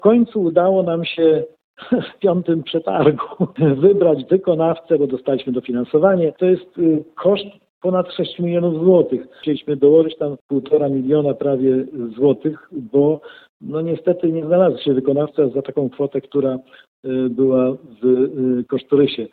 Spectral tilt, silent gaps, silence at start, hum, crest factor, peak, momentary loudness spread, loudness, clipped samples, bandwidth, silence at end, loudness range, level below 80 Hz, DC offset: -11 dB/octave; 1.64-1.74 s, 7.70-7.81 s, 10.41-10.49 s, 13.49-13.60 s, 16.88-17.03 s; 0.05 s; none; 16 dB; 0 dBFS; 9 LU; -18 LUFS; under 0.1%; 4.5 kHz; 0.05 s; 3 LU; -60 dBFS; under 0.1%